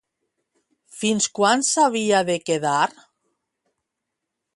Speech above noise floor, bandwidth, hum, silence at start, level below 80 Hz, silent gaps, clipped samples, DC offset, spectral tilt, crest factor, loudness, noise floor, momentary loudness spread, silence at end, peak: 61 dB; 11.5 kHz; none; 0.95 s; -70 dBFS; none; under 0.1%; under 0.1%; -3 dB/octave; 20 dB; -20 LUFS; -82 dBFS; 6 LU; 1.65 s; -4 dBFS